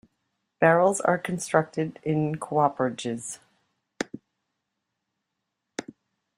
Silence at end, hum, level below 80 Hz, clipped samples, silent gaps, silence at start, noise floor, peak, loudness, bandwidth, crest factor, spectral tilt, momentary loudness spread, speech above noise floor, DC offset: 0.55 s; none; -68 dBFS; under 0.1%; none; 0.6 s; -82 dBFS; -4 dBFS; -25 LUFS; 15.5 kHz; 24 dB; -5.5 dB/octave; 18 LU; 57 dB; under 0.1%